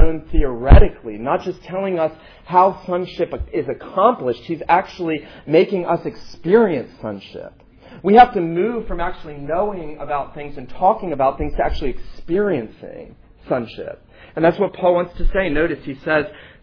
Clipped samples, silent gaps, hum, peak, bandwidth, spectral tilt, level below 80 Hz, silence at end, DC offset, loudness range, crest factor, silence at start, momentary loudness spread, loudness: under 0.1%; none; none; 0 dBFS; 5.4 kHz; -9 dB/octave; -24 dBFS; 0.2 s; under 0.1%; 4 LU; 18 dB; 0 s; 16 LU; -19 LUFS